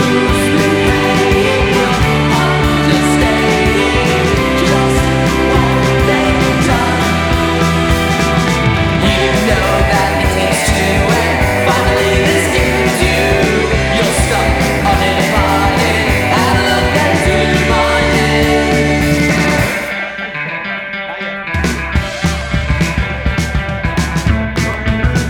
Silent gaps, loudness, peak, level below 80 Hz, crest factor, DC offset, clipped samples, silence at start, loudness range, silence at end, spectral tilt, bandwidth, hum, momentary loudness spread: none; -12 LUFS; 0 dBFS; -22 dBFS; 12 dB; under 0.1%; under 0.1%; 0 s; 5 LU; 0 s; -5 dB/octave; over 20 kHz; none; 6 LU